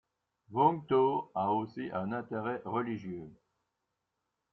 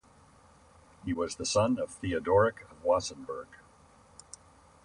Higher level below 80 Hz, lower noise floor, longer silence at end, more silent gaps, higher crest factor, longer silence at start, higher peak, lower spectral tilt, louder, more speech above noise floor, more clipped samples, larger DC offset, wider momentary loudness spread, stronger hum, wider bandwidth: second, -74 dBFS vs -56 dBFS; first, -85 dBFS vs -59 dBFS; about the same, 1.2 s vs 1.3 s; neither; about the same, 20 dB vs 20 dB; second, 0.5 s vs 1.05 s; about the same, -14 dBFS vs -12 dBFS; first, -6 dB/octave vs -4.5 dB/octave; second, -33 LUFS vs -30 LUFS; first, 53 dB vs 30 dB; neither; neither; second, 12 LU vs 24 LU; neither; second, 5.8 kHz vs 11 kHz